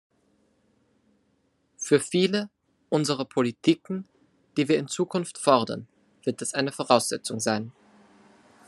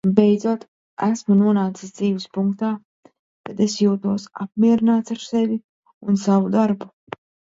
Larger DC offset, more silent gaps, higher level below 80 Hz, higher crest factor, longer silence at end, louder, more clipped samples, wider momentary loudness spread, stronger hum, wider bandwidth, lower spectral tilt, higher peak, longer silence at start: neither; second, none vs 0.68-0.97 s, 2.85-3.03 s, 3.19-3.44 s, 5.64-5.83 s, 5.94-6.01 s; second, -74 dBFS vs -64 dBFS; about the same, 24 dB vs 20 dB; first, 0.95 s vs 0.6 s; second, -26 LUFS vs -20 LUFS; neither; second, 12 LU vs 16 LU; neither; first, 13 kHz vs 7.8 kHz; second, -4.5 dB/octave vs -7 dB/octave; second, -4 dBFS vs 0 dBFS; first, 1.8 s vs 0.05 s